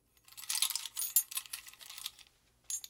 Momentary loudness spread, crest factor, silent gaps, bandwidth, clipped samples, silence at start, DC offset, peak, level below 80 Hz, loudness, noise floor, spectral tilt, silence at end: 17 LU; 26 dB; none; 18 kHz; under 0.1%; 0.3 s; under 0.1%; -12 dBFS; -78 dBFS; -35 LUFS; -65 dBFS; 4 dB/octave; 0 s